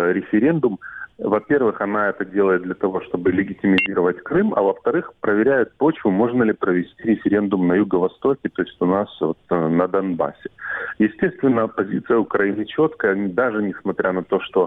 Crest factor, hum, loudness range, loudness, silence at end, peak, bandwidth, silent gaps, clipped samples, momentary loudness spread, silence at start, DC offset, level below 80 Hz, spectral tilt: 18 dB; none; 2 LU; -20 LUFS; 0 s; 0 dBFS; 4.3 kHz; none; under 0.1%; 6 LU; 0 s; under 0.1%; -56 dBFS; -9.5 dB/octave